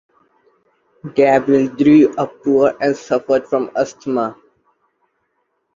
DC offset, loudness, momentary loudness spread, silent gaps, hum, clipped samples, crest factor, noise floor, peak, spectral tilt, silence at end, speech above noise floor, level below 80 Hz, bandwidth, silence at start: under 0.1%; -16 LUFS; 10 LU; none; none; under 0.1%; 16 dB; -68 dBFS; -2 dBFS; -7 dB/octave; 1.4 s; 54 dB; -58 dBFS; 7.4 kHz; 1.05 s